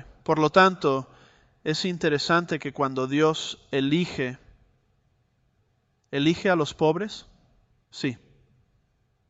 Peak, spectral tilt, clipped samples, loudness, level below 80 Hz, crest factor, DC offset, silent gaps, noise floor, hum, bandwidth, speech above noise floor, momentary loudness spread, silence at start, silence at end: -6 dBFS; -5.5 dB/octave; under 0.1%; -25 LUFS; -60 dBFS; 22 dB; under 0.1%; none; -69 dBFS; none; 8.2 kHz; 45 dB; 14 LU; 0.3 s; 1.15 s